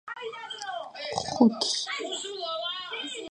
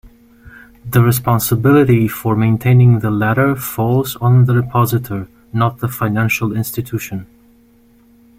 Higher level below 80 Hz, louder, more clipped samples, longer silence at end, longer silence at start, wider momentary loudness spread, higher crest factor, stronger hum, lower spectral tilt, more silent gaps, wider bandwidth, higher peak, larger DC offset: second, -68 dBFS vs -44 dBFS; second, -29 LUFS vs -15 LUFS; neither; second, 0 s vs 1.15 s; about the same, 0.05 s vs 0.05 s; about the same, 14 LU vs 12 LU; first, 24 dB vs 14 dB; neither; second, -3 dB/octave vs -7 dB/octave; neither; second, 10.5 kHz vs 16.5 kHz; second, -6 dBFS vs -2 dBFS; neither